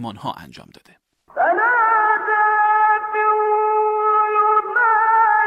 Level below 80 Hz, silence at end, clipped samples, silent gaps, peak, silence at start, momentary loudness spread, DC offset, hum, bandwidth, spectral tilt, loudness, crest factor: -66 dBFS; 0 s; under 0.1%; none; -6 dBFS; 0 s; 11 LU; under 0.1%; none; 5.8 kHz; -5.5 dB/octave; -16 LUFS; 12 dB